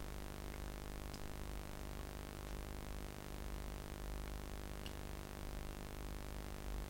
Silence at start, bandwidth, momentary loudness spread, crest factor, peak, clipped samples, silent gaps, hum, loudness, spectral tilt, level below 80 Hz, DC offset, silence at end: 0 s; 16.5 kHz; 1 LU; 18 dB; -30 dBFS; under 0.1%; none; none; -49 LUFS; -5 dB/octave; -50 dBFS; under 0.1%; 0 s